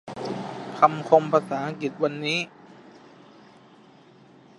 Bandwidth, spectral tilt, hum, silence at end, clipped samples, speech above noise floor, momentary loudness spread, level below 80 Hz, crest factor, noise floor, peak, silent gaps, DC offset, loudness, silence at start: 11.5 kHz; -5.5 dB/octave; none; 1.6 s; under 0.1%; 30 dB; 14 LU; -74 dBFS; 26 dB; -52 dBFS; -2 dBFS; none; under 0.1%; -24 LUFS; 0.05 s